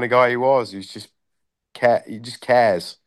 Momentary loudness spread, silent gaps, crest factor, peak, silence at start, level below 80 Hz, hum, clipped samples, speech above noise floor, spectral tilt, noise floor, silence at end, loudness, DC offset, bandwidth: 17 LU; none; 16 dB; -4 dBFS; 0 s; -70 dBFS; none; under 0.1%; 58 dB; -5 dB/octave; -78 dBFS; 0.15 s; -18 LUFS; under 0.1%; 12.5 kHz